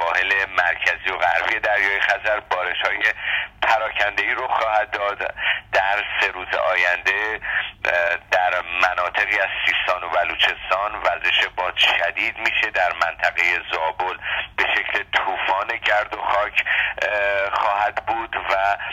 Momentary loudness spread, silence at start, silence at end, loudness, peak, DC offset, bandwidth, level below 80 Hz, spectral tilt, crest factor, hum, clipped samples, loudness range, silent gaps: 5 LU; 0 s; 0 s; -20 LUFS; -2 dBFS; under 0.1%; 14.5 kHz; -50 dBFS; -2 dB/octave; 18 dB; none; under 0.1%; 2 LU; none